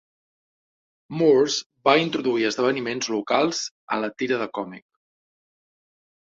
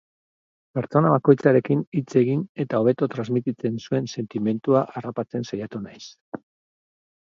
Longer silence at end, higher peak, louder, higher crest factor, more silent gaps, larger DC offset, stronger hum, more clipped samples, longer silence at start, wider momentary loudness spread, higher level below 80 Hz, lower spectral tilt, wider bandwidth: first, 1.45 s vs 1 s; about the same, -2 dBFS vs -2 dBFS; about the same, -23 LUFS vs -23 LUFS; about the same, 22 dB vs 22 dB; about the same, 1.66-1.70 s, 3.71-3.88 s vs 1.87-1.92 s, 2.49-2.55 s, 6.21-6.32 s; neither; neither; neither; first, 1.1 s vs 0.75 s; second, 11 LU vs 18 LU; about the same, -68 dBFS vs -66 dBFS; second, -4 dB/octave vs -8 dB/octave; about the same, 7.8 kHz vs 7.4 kHz